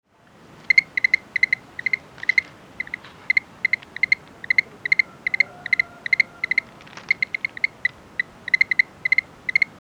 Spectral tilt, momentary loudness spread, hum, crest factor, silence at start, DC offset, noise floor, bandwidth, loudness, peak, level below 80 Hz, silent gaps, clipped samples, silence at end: -1.5 dB/octave; 11 LU; none; 22 dB; 0.7 s; under 0.1%; -51 dBFS; 10 kHz; -21 LUFS; -2 dBFS; -62 dBFS; none; under 0.1%; 0.15 s